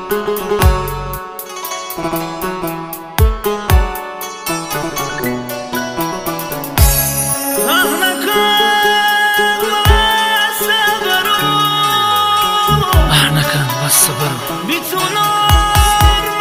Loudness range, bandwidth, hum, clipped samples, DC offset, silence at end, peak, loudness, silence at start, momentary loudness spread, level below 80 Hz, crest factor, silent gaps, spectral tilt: 7 LU; 16.5 kHz; none; under 0.1%; under 0.1%; 0 s; 0 dBFS; -13 LUFS; 0 s; 11 LU; -22 dBFS; 14 dB; none; -3 dB/octave